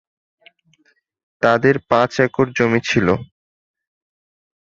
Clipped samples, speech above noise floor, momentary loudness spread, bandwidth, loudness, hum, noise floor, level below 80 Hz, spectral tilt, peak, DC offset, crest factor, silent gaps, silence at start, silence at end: under 0.1%; 45 dB; 5 LU; 7.6 kHz; -17 LUFS; none; -61 dBFS; -50 dBFS; -6 dB/octave; -2 dBFS; under 0.1%; 18 dB; none; 1.4 s; 1.45 s